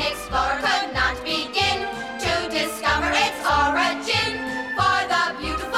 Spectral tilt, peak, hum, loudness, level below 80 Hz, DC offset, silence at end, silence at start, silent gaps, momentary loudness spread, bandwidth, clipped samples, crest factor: -3 dB/octave; -8 dBFS; none; -22 LUFS; -40 dBFS; under 0.1%; 0 s; 0 s; none; 6 LU; 17 kHz; under 0.1%; 14 dB